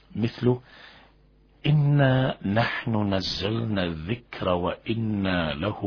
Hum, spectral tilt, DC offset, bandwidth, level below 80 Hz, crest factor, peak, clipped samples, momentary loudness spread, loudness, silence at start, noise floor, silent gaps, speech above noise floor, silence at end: none; -7.5 dB/octave; under 0.1%; 5.4 kHz; -48 dBFS; 18 dB; -8 dBFS; under 0.1%; 9 LU; -25 LUFS; 0.15 s; -58 dBFS; none; 33 dB; 0 s